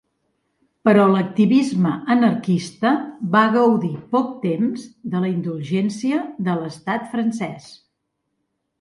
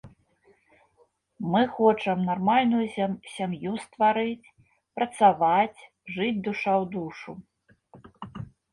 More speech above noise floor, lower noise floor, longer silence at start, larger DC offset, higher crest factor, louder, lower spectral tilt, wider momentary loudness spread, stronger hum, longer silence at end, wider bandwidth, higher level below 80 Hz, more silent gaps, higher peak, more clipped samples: first, 56 dB vs 41 dB; first, -75 dBFS vs -66 dBFS; first, 0.85 s vs 0.05 s; neither; about the same, 18 dB vs 20 dB; first, -20 LUFS vs -25 LUFS; about the same, -7 dB/octave vs -6.5 dB/octave; second, 10 LU vs 20 LU; neither; first, 1.05 s vs 0.3 s; about the same, 11.5 kHz vs 11.5 kHz; about the same, -66 dBFS vs -64 dBFS; neither; first, -2 dBFS vs -6 dBFS; neither